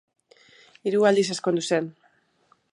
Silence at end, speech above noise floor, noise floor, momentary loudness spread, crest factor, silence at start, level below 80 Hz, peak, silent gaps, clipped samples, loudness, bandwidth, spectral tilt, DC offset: 0.8 s; 42 dB; -64 dBFS; 11 LU; 18 dB; 0.85 s; -78 dBFS; -8 dBFS; none; under 0.1%; -23 LUFS; 11.5 kHz; -4.5 dB/octave; under 0.1%